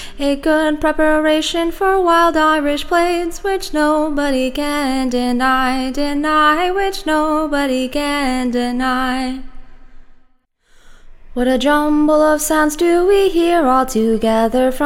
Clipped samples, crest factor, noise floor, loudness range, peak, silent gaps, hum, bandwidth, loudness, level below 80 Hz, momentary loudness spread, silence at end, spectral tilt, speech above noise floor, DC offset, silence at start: under 0.1%; 14 dB; -55 dBFS; 6 LU; 0 dBFS; none; none; 17 kHz; -15 LUFS; -32 dBFS; 6 LU; 0 s; -3.5 dB/octave; 40 dB; under 0.1%; 0 s